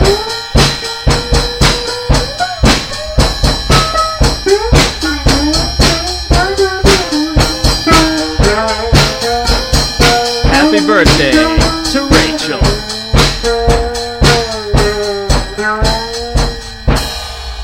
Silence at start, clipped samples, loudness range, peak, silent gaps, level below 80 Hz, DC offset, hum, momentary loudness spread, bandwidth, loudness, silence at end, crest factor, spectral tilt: 0 s; 0.5%; 3 LU; 0 dBFS; none; -16 dBFS; under 0.1%; none; 7 LU; 16.5 kHz; -11 LUFS; 0 s; 12 dB; -4 dB/octave